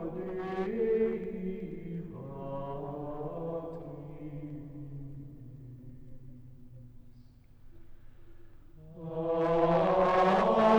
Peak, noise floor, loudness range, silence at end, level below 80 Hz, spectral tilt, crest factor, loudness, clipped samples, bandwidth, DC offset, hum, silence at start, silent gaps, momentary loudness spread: -14 dBFS; -55 dBFS; 22 LU; 0 s; -52 dBFS; -8 dB/octave; 20 dB; -32 LUFS; under 0.1%; 9.2 kHz; under 0.1%; none; 0 s; none; 27 LU